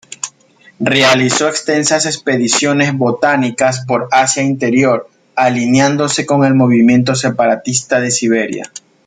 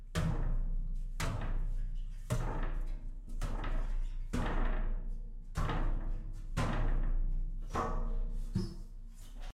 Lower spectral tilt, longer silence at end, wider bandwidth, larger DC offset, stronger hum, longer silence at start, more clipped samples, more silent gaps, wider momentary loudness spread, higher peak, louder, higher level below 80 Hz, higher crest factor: second, -4 dB/octave vs -6 dB/octave; first, 0.3 s vs 0.05 s; second, 9.6 kHz vs 11.5 kHz; neither; neither; about the same, 0.1 s vs 0 s; neither; neither; about the same, 9 LU vs 10 LU; first, 0 dBFS vs -20 dBFS; first, -12 LUFS vs -40 LUFS; second, -56 dBFS vs -34 dBFS; about the same, 12 dB vs 14 dB